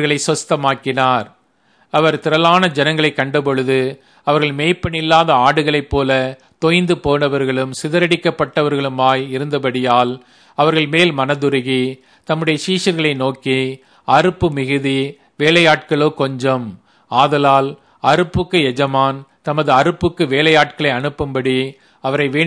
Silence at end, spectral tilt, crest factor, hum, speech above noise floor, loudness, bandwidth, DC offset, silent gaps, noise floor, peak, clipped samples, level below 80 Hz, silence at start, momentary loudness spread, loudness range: 0 s; -5 dB/octave; 16 dB; none; 41 dB; -15 LUFS; 11 kHz; under 0.1%; none; -57 dBFS; 0 dBFS; under 0.1%; -44 dBFS; 0 s; 8 LU; 2 LU